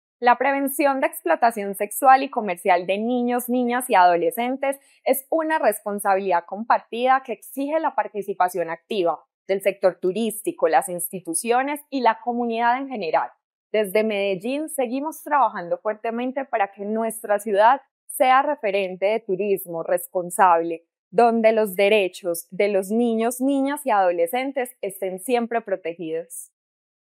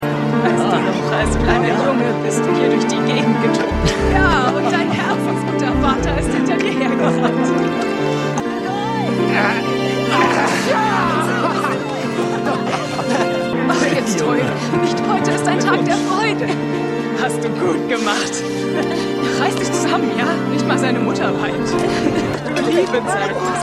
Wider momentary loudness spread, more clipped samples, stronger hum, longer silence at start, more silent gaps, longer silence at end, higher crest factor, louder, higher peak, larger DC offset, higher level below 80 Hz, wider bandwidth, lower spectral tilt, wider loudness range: first, 10 LU vs 4 LU; neither; neither; first, 0.2 s vs 0 s; first, 9.34-9.45 s, 13.44-13.70 s, 17.91-18.08 s, 20.99-21.11 s vs none; first, 0.65 s vs 0 s; about the same, 20 dB vs 16 dB; second, -22 LUFS vs -17 LUFS; about the same, -2 dBFS vs 0 dBFS; neither; second, -88 dBFS vs -34 dBFS; first, 16 kHz vs 14 kHz; about the same, -4 dB/octave vs -5 dB/octave; about the same, 4 LU vs 2 LU